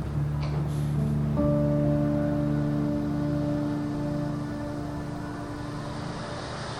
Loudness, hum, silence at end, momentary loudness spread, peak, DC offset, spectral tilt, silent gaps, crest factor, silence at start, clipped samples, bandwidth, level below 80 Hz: -28 LUFS; none; 0 s; 10 LU; -14 dBFS; under 0.1%; -8 dB/octave; none; 14 dB; 0 s; under 0.1%; 11.5 kHz; -42 dBFS